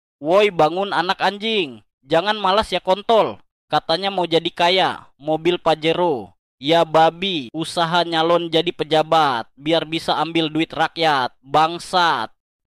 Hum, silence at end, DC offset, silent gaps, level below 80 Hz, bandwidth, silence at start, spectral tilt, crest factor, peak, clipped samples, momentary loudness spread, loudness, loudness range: none; 0.4 s; under 0.1%; 1.93-1.98 s, 3.51-3.68 s, 6.39-6.58 s; -54 dBFS; 14.5 kHz; 0.2 s; -4.5 dB/octave; 14 dB; -4 dBFS; under 0.1%; 7 LU; -19 LUFS; 1 LU